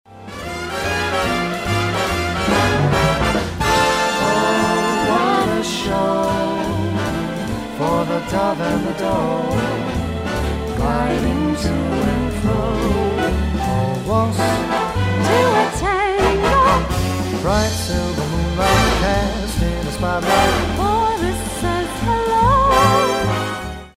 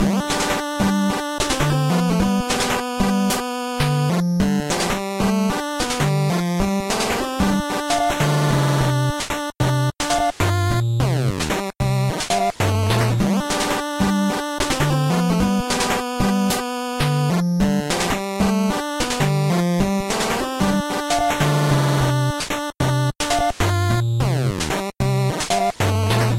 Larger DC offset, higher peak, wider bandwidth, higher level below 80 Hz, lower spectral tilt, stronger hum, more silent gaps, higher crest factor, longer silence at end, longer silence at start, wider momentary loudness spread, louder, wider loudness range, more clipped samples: neither; first, -2 dBFS vs -6 dBFS; about the same, 16 kHz vs 16 kHz; first, -28 dBFS vs -36 dBFS; about the same, -5 dB/octave vs -5 dB/octave; neither; neither; about the same, 16 dB vs 14 dB; about the same, 0.05 s vs 0 s; about the same, 0.1 s vs 0 s; first, 7 LU vs 4 LU; about the same, -18 LUFS vs -20 LUFS; first, 4 LU vs 1 LU; neither